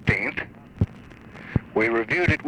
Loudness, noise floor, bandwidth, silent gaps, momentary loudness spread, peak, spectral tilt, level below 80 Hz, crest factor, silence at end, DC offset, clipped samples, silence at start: -25 LUFS; -44 dBFS; 9.8 kHz; none; 20 LU; -6 dBFS; -7.5 dB/octave; -42 dBFS; 18 dB; 0 s; under 0.1%; under 0.1%; 0 s